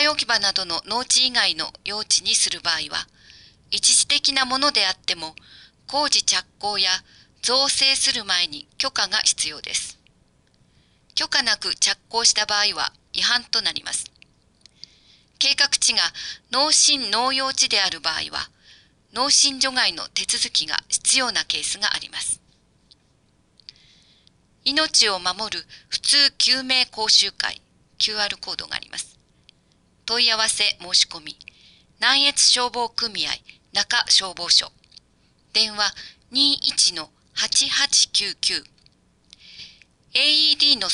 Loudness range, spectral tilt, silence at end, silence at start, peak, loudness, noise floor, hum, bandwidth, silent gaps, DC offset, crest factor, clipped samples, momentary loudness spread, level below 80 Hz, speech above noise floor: 4 LU; 1 dB/octave; 0 s; 0 s; -2 dBFS; -19 LUFS; -61 dBFS; none; 11.5 kHz; none; under 0.1%; 20 dB; under 0.1%; 12 LU; -60 dBFS; 40 dB